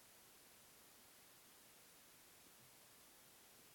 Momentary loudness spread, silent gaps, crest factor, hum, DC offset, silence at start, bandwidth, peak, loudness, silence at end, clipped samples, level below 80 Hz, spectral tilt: 0 LU; none; 14 dB; none; under 0.1%; 0 s; 17 kHz; -52 dBFS; -64 LUFS; 0 s; under 0.1%; -90 dBFS; -1.5 dB/octave